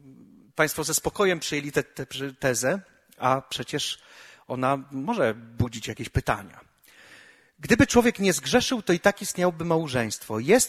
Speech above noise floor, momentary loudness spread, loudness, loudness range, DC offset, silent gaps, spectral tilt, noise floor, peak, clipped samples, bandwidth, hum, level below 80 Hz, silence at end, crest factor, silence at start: 28 dB; 10 LU; -25 LUFS; 6 LU; under 0.1%; none; -4 dB/octave; -53 dBFS; -4 dBFS; under 0.1%; 16 kHz; none; -48 dBFS; 0 s; 22 dB; 0.05 s